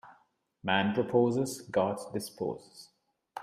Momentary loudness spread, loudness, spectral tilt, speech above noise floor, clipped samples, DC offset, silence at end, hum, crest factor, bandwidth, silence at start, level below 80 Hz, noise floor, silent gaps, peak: 12 LU; -31 LUFS; -5 dB/octave; 38 dB; under 0.1%; under 0.1%; 0 s; none; 20 dB; 15.5 kHz; 0.05 s; -72 dBFS; -69 dBFS; none; -12 dBFS